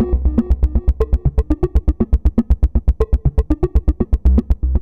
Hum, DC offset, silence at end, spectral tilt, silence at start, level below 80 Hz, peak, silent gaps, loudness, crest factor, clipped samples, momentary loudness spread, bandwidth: none; under 0.1%; 0 s; -11 dB/octave; 0 s; -16 dBFS; -4 dBFS; none; -18 LUFS; 12 dB; under 0.1%; 3 LU; 2.9 kHz